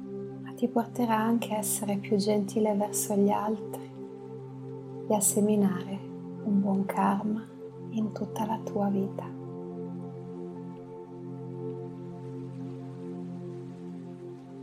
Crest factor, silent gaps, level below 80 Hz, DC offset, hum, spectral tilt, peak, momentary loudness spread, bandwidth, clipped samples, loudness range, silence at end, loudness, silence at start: 18 dB; none; -72 dBFS; under 0.1%; none; -5.5 dB/octave; -12 dBFS; 16 LU; 16 kHz; under 0.1%; 12 LU; 0 s; -30 LUFS; 0 s